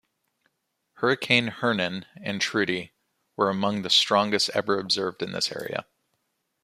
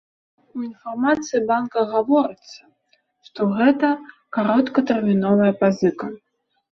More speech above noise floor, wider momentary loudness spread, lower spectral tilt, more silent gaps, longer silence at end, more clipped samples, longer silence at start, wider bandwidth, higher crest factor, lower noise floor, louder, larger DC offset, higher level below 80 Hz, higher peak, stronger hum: first, 51 dB vs 42 dB; about the same, 13 LU vs 14 LU; second, -3.5 dB/octave vs -7 dB/octave; neither; first, 0.8 s vs 0.6 s; neither; first, 1 s vs 0.55 s; first, 15.5 kHz vs 6.8 kHz; about the same, 22 dB vs 18 dB; first, -76 dBFS vs -61 dBFS; second, -25 LUFS vs -20 LUFS; neither; second, -70 dBFS vs -64 dBFS; about the same, -4 dBFS vs -4 dBFS; neither